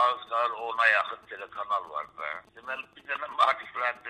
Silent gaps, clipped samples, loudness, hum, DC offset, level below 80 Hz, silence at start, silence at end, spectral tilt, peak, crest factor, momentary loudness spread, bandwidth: none; under 0.1%; -28 LUFS; none; under 0.1%; -74 dBFS; 0 s; 0 s; -1.5 dB/octave; -8 dBFS; 22 dB; 15 LU; 10.5 kHz